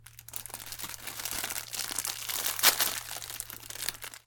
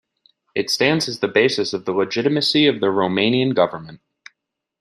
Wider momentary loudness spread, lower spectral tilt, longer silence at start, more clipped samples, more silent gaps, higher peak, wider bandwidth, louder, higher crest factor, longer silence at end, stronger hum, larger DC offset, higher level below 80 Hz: first, 16 LU vs 6 LU; second, 0.5 dB/octave vs -4.5 dB/octave; second, 0 s vs 0.55 s; neither; neither; second, -6 dBFS vs -2 dBFS; first, 17.5 kHz vs 13 kHz; second, -31 LUFS vs -18 LUFS; first, 28 dB vs 18 dB; second, 0.1 s vs 0.85 s; neither; neither; about the same, -60 dBFS vs -64 dBFS